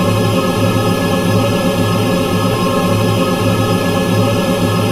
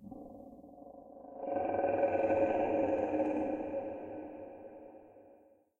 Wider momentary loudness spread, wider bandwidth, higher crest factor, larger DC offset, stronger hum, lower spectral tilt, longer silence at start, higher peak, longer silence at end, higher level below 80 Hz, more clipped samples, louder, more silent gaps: second, 1 LU vs 22 LU; first, 16 kHz vs 6.8 kHz; about the same, 14 dB vs 18 dB; neither; neither; second, -6 dB/octave vs -8.5 dB/octave; about the same, 0 s vs 0 s; first, 0 dBFS vs -18 dBFS; second, 0 s vs 0.45 s; first, -34 dBFS vs -68 dBFS; neither; first, -14 LUFS vs -34 LUFS; neither